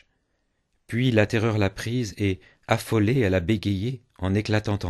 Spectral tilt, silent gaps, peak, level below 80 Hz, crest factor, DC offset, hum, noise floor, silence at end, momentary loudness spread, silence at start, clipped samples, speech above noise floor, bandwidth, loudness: -6.5 dB/octave; none; -4 dBFS; -50 dBFS; 20 dB; under 0.1%; none; -73 dBFS; 0 s; 8 LU; 0.9 s; under 0.1%; 49 dB; 12.5 kHz; -24 LUFS